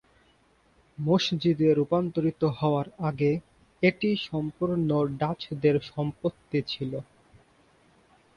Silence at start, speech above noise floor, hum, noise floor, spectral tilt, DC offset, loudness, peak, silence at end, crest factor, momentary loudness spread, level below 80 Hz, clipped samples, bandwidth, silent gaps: 1 s; 37 dB; none; -63 dBFS; -7.5 dB/octave; under 0.1%; -27 LUFS; -8 dBFS; 1.35 s; 20 dB; 9 LU; -60 dBFS; under 0.1%; 7 kHz; none